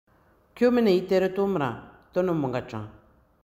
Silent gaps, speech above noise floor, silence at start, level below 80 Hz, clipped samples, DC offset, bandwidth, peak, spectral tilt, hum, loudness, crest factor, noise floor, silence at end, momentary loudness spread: none; 33 dB; 0.55 s; -58 dBFS; under 0.1%; under 0.1%; 15.5 kHz; -10 dBFS; -7.5 dB/octave; none; -25 LUFS; 16 dB; -57 dBFS; 0.55 s; 17 LU